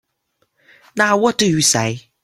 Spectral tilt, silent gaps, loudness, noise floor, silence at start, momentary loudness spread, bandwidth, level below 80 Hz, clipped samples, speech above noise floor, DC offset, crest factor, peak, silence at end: -3 dB/octave; none; -15 LUFS; -68 dBFS; 0.95 s; 9 LU; 16.5 kHz; -56 dBFS; under 0.1%; 52 dB; under 0.1%; 18 dB; 0 dBFS; 0.25 s